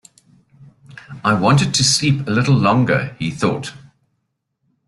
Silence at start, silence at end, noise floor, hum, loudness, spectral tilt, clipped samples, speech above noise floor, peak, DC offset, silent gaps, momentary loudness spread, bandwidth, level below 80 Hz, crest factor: 0.6 s; 1.1 s; -72 dBFS; none; -16 LUFS; -4.5 dB/octave; under 0.1%; 56 dB; -2 dBFS; under 0.1%; none; 11 LU; 12 kHz; -50 dBFS; 16 dB